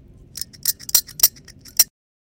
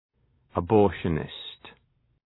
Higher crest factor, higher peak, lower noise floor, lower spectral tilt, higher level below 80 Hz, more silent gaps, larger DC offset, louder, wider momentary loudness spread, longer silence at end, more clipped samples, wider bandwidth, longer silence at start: about the same, 22 dB vs 22 dB; first, 0 dBFS vs -6 dBFS; second, -44 dBFS vs -68 dBFS; second, 1.5 dB/octave vs -10.5 dB/octave; about the same, -52 dBFS vs -50 dBFS; neither; neither; first, -18 LUFS vs -26 LUFS; second, 16 LU vs 19 LU; second, 0.4 s vs 0.55 s; neither; first, 17.5 kHz vs 4.1 kHz; second, 0.35 s vs 0.55 s